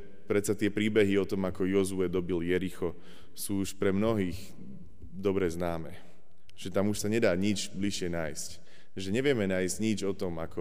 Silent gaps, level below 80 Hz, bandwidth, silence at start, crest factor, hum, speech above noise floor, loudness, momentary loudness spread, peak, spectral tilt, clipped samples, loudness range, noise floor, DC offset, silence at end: none; -56 dBFS; 15.5 kHz; 0 s; 18 dB; none; 31 dB; -31 LUFS; 15 LU; -14 dBFS; -5.5 dB/octave; under 0.1%; 3 LU; -61 dBFS; 1%; 0 s